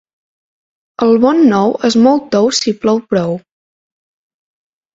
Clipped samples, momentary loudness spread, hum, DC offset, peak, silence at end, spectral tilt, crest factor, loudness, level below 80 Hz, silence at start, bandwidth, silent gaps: under 0.1%; 7 LU; none; under 0.1%; 0 dBFS; 1.55 s; -5 dB/octave; 14 dB; -12 LUFS; -54 dBFS; 1 s; 7.8 kHz; none